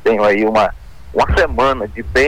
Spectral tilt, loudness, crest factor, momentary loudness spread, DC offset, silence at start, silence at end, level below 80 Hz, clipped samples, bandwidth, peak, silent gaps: -5.5 dB/octave; -15 LUFS; 10 dB; 7 LU; under 0.1%; 0 s; 0 s; -28 dBFS; under 0.1%; 19 kHz; -6 dBFS; none